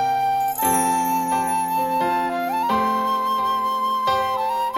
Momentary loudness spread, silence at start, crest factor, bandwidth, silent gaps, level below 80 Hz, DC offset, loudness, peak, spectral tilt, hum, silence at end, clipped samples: 3 LU; 0 s; 14 dB; 17 kHz; none; -56 dBFS; under 0.1%; -21 LUFS; -8 dBFS; -3 dB/octave; none; 0 s; under 0.1%